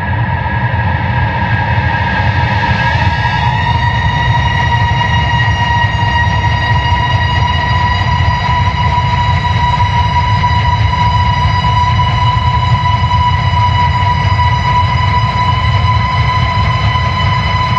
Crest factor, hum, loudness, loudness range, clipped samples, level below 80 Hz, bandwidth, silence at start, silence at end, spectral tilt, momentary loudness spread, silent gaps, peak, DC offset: 12 dB; none; -12 LUFS; 1 LU; under 0.1%; -22 dBFS; 7.4 kHz; 0 s; 0 s; -6 dB/octave; 1 LU; none; 0 dBFS; under 0.1%